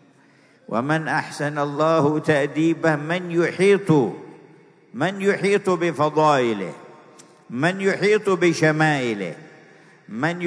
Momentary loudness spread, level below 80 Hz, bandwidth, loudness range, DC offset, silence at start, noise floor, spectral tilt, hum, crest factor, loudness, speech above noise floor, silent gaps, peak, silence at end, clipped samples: 11 LU; -74 dBFS; 11 kHz; 2 LU; under 0.1%; 0.7 s; -54 dBFS; -6 dB/octave; none; 18 dB; -20 LUFS; 34 dB; none; -4 dBFS; 0 s; under 0.1%